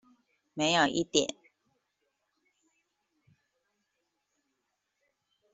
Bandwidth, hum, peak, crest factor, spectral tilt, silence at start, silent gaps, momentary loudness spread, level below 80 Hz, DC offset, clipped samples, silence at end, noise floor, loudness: 8.2 kHz; none; -10 dBFS; 26 dB; -3 dB/octave; 0.55 s; none; 11 LU; -72 dBFS; under 0.1%; under 0.1%; 4.2 s; -82 dBFS; -28 LUFS